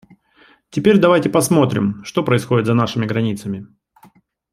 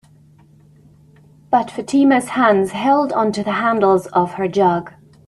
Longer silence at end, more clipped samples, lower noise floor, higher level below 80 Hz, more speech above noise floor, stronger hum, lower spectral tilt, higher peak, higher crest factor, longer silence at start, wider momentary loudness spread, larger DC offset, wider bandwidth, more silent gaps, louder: first, 0.9 s vs 0.4 s; neither; first, -53 dBFS vs -49 dBFS; about the same, -56 dBFS vs -58 dBFS; first, 37 dB vs 33 dB; neither; about the same, -6 dB/octave vs -6 dB/octave; about the same, -2 dBFS vs -2 dBFS; about the same, 16 dB vs 16 dB; second, 0.75 s vs 1.5 s; first, 13 LU vs 5 LU; neither; first, 15.5 kHz vs 12.5 kHz; neither; about the same, -17 LUFS vs -17 LUFS